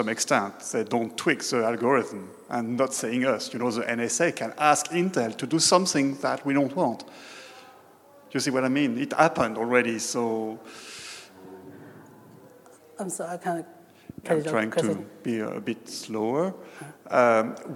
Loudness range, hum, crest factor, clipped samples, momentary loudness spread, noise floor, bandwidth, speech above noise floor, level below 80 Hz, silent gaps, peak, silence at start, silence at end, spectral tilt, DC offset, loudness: 10 LU; none; 22 dB; under 0.1%; 20 LU; -53 dBFS; 16.5 kHz; 27 dB; -72 dBFS; none; -4 dBFS; 0 s; 0 s; -4 dB/octave; under 0.1%; -26 LUFS